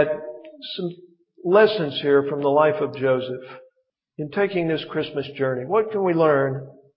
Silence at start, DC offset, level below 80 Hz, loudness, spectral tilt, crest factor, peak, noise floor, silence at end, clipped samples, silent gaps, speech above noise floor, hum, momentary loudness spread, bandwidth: 0 s; under 0.1%; -68 dBFS; -22 LUFS; -10.5 dB/octave; 18 dB; -4 dBFS; -70 dBFS; 0.25 s; under 0.1%; none; 49 dB; none; 15 LU; 5.6 kHz